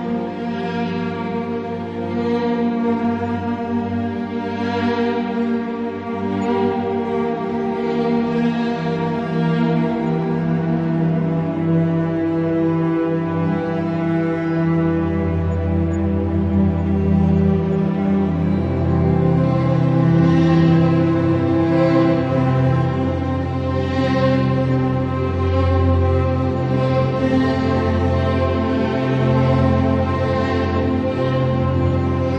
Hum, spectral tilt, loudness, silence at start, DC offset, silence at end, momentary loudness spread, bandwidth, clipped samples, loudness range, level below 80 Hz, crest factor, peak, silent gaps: none; -9 dB/octave; -19 LUFS; 0 s; under 0.1%; 0 s; 6 LU; 7.2 kHz; under 0.1%; 5 LU; -42 dBFS; 14 dB; -4 dBFS; none